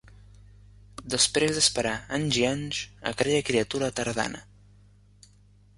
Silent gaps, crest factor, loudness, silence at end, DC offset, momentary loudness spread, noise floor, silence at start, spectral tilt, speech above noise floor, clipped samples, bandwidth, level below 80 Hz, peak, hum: none; 22 dB; -26 LUFS; 1.35 s; under 0.1%; 11 LU; -57 dBFS; 1 s; -3 dB/octave; 30 dB; under 0.1%; 11.5 kHz; -54 dBFS; -8 dBFS; 50 Hz at -45 dBFS